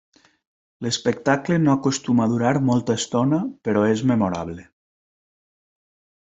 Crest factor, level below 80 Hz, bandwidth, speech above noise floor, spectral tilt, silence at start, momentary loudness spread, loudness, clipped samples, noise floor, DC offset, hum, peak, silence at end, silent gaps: 20 dB; -60 dBFS; 8.2 kHz; over 70 dB; -5.5 dB/octave; 0.8 s; 7 LU; -21 LUFS; under 0.1%; under -90 dBFS; under 0.1%; none; -4 dBFS; 1.65 s; none